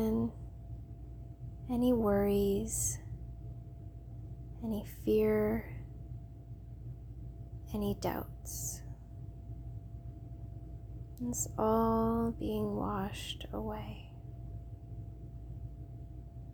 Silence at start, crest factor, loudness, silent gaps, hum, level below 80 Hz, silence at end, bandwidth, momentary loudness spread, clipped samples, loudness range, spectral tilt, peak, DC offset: 0 s; 18 dB; -35 LUFS; none; none; -48 dBFS; 0 s; over 20 kHz; 19 LU; under 0.1%; 8 LU; -5.5 dB/octave; -18 dBFS; under 0.1%